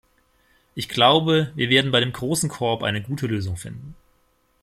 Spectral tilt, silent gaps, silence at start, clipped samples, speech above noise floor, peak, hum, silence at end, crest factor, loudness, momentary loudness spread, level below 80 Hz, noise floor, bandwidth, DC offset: -4.5 dB/octave; none; 0.75 s; under 0.1%; 42 dB; -2 dBFS; none; 0.7 s; 20 dB; -21 LUFS; 17 LU; -54 dBFS; -64 dBFS; 15.5 kHz; under 0.1%